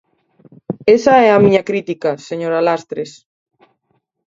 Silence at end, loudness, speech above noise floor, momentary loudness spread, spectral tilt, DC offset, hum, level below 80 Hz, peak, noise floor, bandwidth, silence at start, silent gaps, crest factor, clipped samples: 1.2 s; -14 LUFS; 53 dB; 17 LU; -6 dB/octave; under 0.1%; none; -58 dBFS; 0 dBFS; -66 dBFS; 7.8 kHz; 0.7 s; none; 16 dB; under 0.1%